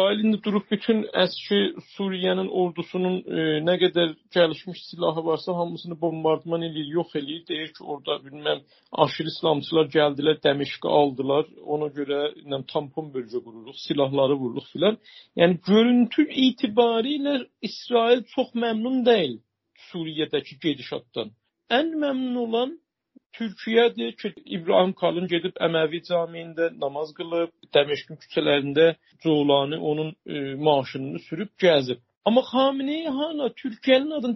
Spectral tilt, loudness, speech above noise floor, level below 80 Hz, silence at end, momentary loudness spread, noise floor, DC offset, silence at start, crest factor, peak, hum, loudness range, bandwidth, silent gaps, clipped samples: -3.5 dB/octave; -24 LUFS; 36 dB; -70 dBFS; 0 s; 12 LU; -60 dBFS; under 0.1%; 0 s; 22 dB; -2 dBFS; none; 5 LU; 6 kHz; 23.26-23.30 s, 32.17-32.21 s; under 0.1%